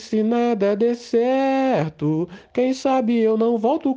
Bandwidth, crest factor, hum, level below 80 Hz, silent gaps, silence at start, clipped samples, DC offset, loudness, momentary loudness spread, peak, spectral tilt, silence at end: 8 kHz; 12 dB; none; -64 dBFS; none; 0 s; under 0.1%; under 0.1%; -20 LUFS; 5 LU; -8 dBFS; -7 dB/octave; 0 s